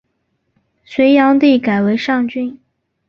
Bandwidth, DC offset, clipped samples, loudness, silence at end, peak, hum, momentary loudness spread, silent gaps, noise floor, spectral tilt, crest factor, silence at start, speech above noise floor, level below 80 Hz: 6.6 kHz; under 0.1%; under 0.1%; -13 LUFS; 0.55 s; -2 dBFS; none; 14 LU; none; -67 dBFS; -7 dB/octave; 14 dB; 0.9 s; 55 dB; -58 dBFS